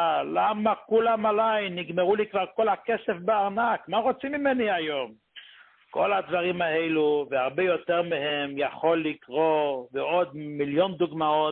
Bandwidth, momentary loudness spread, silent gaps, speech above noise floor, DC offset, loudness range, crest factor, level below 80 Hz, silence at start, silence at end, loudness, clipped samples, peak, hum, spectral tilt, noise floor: 4.3 kHz; 5 LU; none; 28 dB; under 0.1%; 2 LU; 16 dB; -68 dBFS; 0 s; 0 s; -26 LUFS; under 0.1%; -10 dBFS; none; -9.5 dB/octave; -54 dBFS